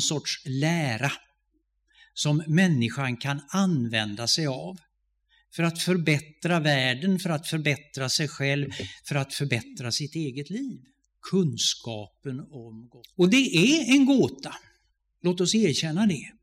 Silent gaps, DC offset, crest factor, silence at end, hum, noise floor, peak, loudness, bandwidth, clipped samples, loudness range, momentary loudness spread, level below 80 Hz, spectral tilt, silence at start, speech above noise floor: none; under 0.1%; 18 dB; 0.1 s; none; -73 dBFS; -8 dBFS; -25 LUFS; 15.5 kHz; under 0.1%; 6 LU; 17 LU; -66 dBFS; -4.5 dB/octave; 0 s; 48 dB